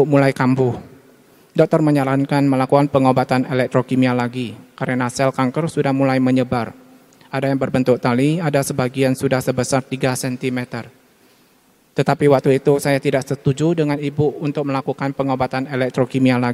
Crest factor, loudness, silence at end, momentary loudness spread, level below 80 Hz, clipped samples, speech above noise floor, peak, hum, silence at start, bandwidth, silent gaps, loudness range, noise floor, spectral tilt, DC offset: 18 dB; -18 LUFS; 0 s; 8 LU; -54 dBFS; under 0.1%; 38 dB; 0 dBFS; none; 0 s; 15 kHz; none; 3 LU; -55 dBFS; -6.5 dB/octave; under 0.1%